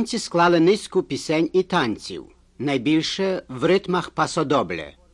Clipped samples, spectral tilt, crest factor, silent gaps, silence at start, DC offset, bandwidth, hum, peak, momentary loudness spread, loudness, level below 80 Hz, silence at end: under 0.1%; -5 dB/octave; 16 dB; none; 0 s; under 0.1%; 11.5 kHz; none; -6 dBFS; 11 LU; -22 LUFS; -54 dBFS; 0.25 s